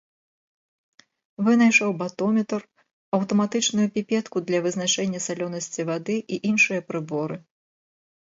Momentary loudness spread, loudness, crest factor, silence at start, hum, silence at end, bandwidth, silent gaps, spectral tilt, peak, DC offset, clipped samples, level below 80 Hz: 11 LU; -23 LUFS; 20 dB; 1.4 s; none; 0.9 s; 8 kHz; 2.93-3.12 s; -4 dB/octave; -6 dBFS; under 0.1%; under 0.1%; -72 dBFS